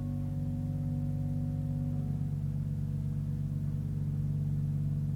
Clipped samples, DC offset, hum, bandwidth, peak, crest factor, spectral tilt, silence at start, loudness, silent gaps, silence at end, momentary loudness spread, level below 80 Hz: under 0.1%; under 0.1%; 60 Hz at -65 dBFS; 3.4 kHz; -22 dBFS; 10 dB; -10 dB/octave; 0 s; -34 LUFS; none; 0 s; 2 LU; -46 dBFS